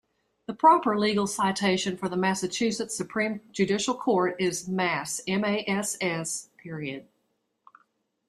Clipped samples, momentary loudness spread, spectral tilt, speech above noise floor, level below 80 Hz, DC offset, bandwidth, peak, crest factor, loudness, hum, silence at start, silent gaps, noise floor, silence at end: under 0.1%; 13 LU; -4 dB/octave; 49 dB; -66 dBFS; under 0.1%; 15 kHz; -8 dBFS; 20 dB; -26 LUFS; none; 0.5 s; none; -75 dBFS; 1.25 s